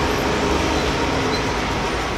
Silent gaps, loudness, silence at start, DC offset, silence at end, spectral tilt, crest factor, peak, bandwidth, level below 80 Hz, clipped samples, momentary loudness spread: none; -20 LUFS; 0 s; under 0.1%; 0 s; -4.5 dB/octave; 14 dB; -6 dBFS; 15.5 kHz; -30 dBFS; under 0.1%; 2 LU